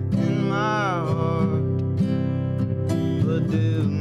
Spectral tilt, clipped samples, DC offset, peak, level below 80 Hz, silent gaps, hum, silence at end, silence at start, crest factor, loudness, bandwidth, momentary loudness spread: -8 dB/octave; under 0.1%; under 0.1%; -10 dBFS; -50 dBFS; none; none; 0 s; 0 s; 12 dB; -23 LUFS; 9.8 kHz; 2 LU